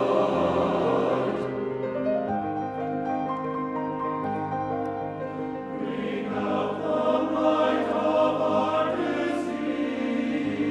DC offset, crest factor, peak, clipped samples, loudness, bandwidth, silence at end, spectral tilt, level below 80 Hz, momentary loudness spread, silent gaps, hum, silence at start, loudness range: under 0.1%; 16 dB; -10 dBFS; under 0.1%; -26 LUFS; 10.5 kHz; 0 s; -7 dB/octave; -60 dBFS; 7 LU; none; none; 0 s; 5 LU